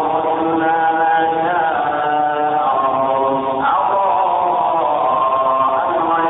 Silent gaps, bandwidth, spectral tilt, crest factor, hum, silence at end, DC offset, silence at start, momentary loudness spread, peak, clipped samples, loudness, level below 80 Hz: none; 4 kHz; -9 dB/octave; 12 dB; none; 0 s; under 0.1%; 0 s; 2 LU; -4 dBFS; under 0.1%; -16 LUFS; -56 dBFS